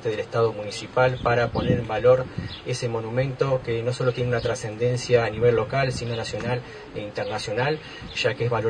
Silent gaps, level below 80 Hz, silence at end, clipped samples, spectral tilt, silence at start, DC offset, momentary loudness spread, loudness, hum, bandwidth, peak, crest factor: none; -46 dBFS; 0 s; under 0.1%; -5.5 dB/octave; 0 s; under 0.1%; 10 LU; -24 LUFS; none; 10 kHz; -6 dBFS; 18 dB